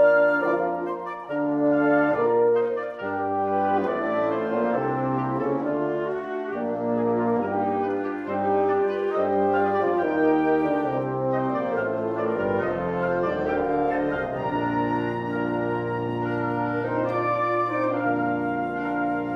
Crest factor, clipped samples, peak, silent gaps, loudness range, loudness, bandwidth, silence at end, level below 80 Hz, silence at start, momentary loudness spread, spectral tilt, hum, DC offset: 16 dB; under 0.1%; -8 dBFS; none; 3 LU; -24 LUFS; 6.2 kHz; 0 s; -56 dBFS; 0 s; 6 LU; -9 dB/octave; none; under 0.1%